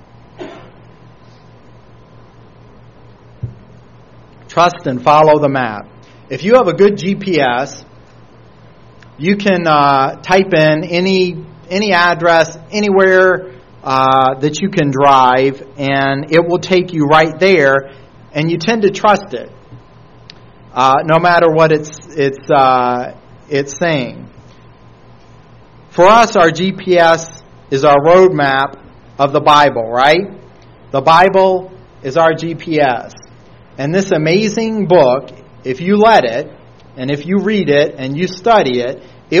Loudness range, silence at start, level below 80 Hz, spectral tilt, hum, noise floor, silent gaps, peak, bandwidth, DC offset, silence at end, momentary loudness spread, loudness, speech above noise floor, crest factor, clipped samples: 4 LU; 0.4 s; -48 dBFS; -5.5 dB/octave; none; -41 dBFS; none; 0 dBFS; 8.8 kHz; 0.4%; 0 s; 15 LU; -12 LUFS; 30 dB; 14 dB; 0.2%